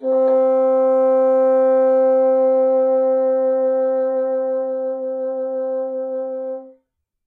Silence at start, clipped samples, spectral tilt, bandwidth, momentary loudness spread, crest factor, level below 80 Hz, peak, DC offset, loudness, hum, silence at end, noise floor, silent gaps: 0 s; under 0.1%; -7.5 dB/octave; 2.5 kHz; 10 LU; 8 dB; -86 dBFS; -8 dBFS; under 0.1%; -18 LUFS; none; 0.55 s; -68 dBFS; none